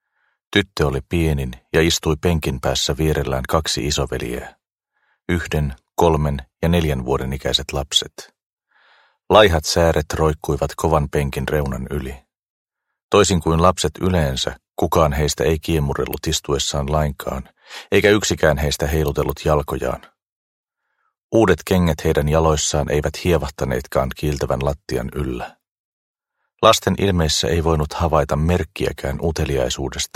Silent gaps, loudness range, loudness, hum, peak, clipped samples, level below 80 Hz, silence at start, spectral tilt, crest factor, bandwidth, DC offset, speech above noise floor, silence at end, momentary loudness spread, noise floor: 8.46-8.57 s, 12.48-12.65 s, 13.03-13.09 s, 20.29-20.63 s, 21.24-21.29 s, 25.71-26.14 s; 4 LU; -19 LUFS; none; 0 dBFS; under 0.1%; -32 dBFS; 0.5 s; -4.5 dB/octave; 20 dB; 16.5 kHz; under 0.1%; 52 dB; 0.1 s; 9 LU; -71 dBFS